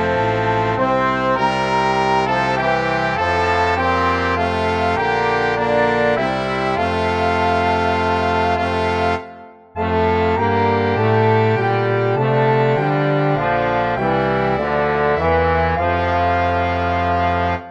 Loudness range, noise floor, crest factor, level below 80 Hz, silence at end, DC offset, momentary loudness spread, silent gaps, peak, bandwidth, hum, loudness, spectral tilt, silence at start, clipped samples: 2 LU; -39 dBFS; 14 dB; -38 dBFS; 0 s; under 0.1%; 3 LU; none; -2 dBFS; 10 kHz; none; -17 LUFS; -6.5 dB/octave; 0 s; under 0.1%